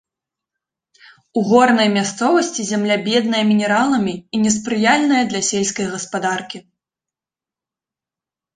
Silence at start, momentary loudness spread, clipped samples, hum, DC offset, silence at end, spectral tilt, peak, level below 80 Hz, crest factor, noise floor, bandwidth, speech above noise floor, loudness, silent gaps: 1.35 s; 9 LU; under 0.1%; none; under 0.1%; 1.95 s; -3.5 dB/octave; -2 dBFS; -60 dBFS; 18 dB; -89 dBFS; 9.6 kHz; 72 dB; -17 LUFS; none